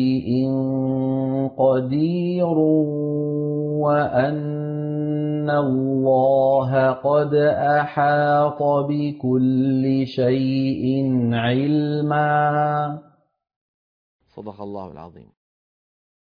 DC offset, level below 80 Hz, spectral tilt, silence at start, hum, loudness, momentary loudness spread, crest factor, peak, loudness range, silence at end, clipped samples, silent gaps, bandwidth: under 0.1%; -60 dBFS; -10.5 dB/octave; 0 s; none; -20 LUFS; 8 LU; 12 dB; -8 dBFS; 6 LU; 1.2 s; under 0.1%; 13.56-14.19 s; 5.2 kHz